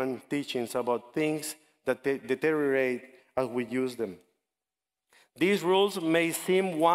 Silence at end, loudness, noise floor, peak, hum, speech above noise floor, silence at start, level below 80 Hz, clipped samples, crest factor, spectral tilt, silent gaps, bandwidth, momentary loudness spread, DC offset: 0 s; -29 LUFS; under -90 dBFS; -10 dBFS; none; over 62 dB; 0 s; -72 dBFS; under 0.1%; 18 dB; -4.5 dB/octave; none; 16 kHz; 10 LU; under 0.1%